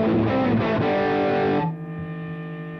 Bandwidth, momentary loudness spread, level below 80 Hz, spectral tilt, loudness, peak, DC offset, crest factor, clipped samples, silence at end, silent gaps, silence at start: 6.4 kHz; 11 LU; -50 dBFS; -9 dB/octave; -23 LUFS; -12 dBFS; under 0.1%; 12 dB; under 0.1%; 0 s; none; 0 s